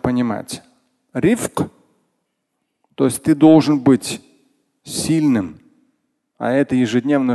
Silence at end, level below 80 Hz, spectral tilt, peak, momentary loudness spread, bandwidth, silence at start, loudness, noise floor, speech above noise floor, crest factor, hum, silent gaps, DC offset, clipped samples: 0 s; -50 dBFS; -6 dB/octave; 0 dBFS; 16 LU; 12.5 kHz; 0.05 s; -17 LUFS; -73 dBFS; 58 dB; 18 dB; none; none; under 0.1%; under 0.1%